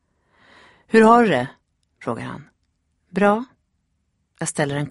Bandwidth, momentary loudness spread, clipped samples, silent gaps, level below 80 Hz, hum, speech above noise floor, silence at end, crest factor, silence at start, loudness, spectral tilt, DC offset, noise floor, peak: 11.5 kHz; 20 LU; under 0.1%; none; -60 dBFS; none; 53 dB; 0 s; 20 dB; 0.95 s; -19 LUFS; -5.5 dB/octave; under 0.1%; -70 dBFS; 0 dBFS